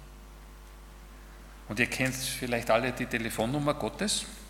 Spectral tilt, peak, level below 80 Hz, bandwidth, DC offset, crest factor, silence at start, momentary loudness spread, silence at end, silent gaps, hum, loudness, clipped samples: -3.5 dB/octave; -8 dBFS; -48 dBFS; 18 kHz; under 0.1%; 24 dB; 0 s; 23 LU; 0 s; none; none; -30 LUFS; under 0.1%